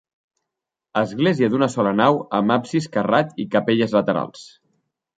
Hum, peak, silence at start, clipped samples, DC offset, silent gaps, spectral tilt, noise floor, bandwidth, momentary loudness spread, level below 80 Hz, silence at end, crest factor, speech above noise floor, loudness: none; -2 dBFS; 0.95 s; under 0.1%; under 0.1%; none; -6.5 dB/octave; -84 dBFS; 9.2 kHz; 6 LU; -62 dBFS; 0.7 s; 20 dB; 65 dB; -20 LUFS